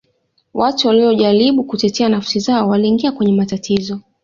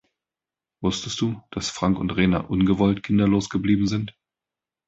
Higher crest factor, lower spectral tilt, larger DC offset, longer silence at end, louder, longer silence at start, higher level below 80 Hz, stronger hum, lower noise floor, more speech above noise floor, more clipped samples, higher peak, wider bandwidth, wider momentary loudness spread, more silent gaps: second, 12 dB vs 18 dB; about the same, -5.5 dB/octave vs -6 dB/octave; neither; second, 0.25 s vs 0.75 s; first, -15 LUFS vs -23 LUFS; second, 0.55 s vs 0.8 s; second, -54 dBFS vs -44 dBFS; neither; second, -63 dBFS vs -90 dBFS; second, 48 dB vs 68 dB; neither; first, -2 dBFS vs -6 dBFS; about the same, 7.4 kHz vs 8 kHz; about the same, 7 LU vs 9 LU; neither